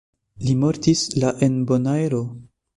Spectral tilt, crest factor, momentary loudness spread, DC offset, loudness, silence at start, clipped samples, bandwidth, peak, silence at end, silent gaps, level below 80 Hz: -6 dB/octave; 18 dB; 7 LU; under 0.1%; -21 LUFS; 0.4 s; under 0.1%; 11.5 kHz; -4 dBFS; 0.35 s; none; -52 dBFS